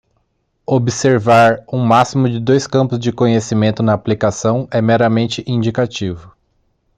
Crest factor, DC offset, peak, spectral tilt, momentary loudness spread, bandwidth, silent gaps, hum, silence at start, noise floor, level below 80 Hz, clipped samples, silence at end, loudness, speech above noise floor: 14 dB; under 0.1%; 0 dBFS; -6 dB/octave; 7 LU; 9.4 kHz; none; none; 0.7 s; -65 dBFS; -50 dBFS; under 0.1%; 0.7 s; -15 LUFS; 51 dB